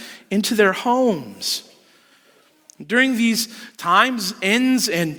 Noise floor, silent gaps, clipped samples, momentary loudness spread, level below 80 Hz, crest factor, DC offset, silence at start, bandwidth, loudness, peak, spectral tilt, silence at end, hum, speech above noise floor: -56 dBFS; none; under 0.1%; 9 LU; -66 dBFS; 20 dB; under 0.1%; 0 s; over 20 kHz; -19 LUFS; 0 dBFS; -3.5 dB/octave; 0 s; none; 37 dB